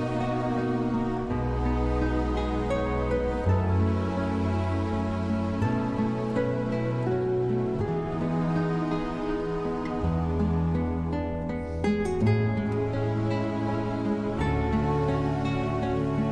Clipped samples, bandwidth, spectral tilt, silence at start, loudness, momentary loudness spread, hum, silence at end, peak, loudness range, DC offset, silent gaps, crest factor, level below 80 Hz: under 0.1%; 9.8 kHz; -8.5 dB/octave; 0 s; -28 LUFS; 4 LU; none; 0 s; -12 dBFS; 1 LU; under 0.1%; none; 14 dB; -38 dBFS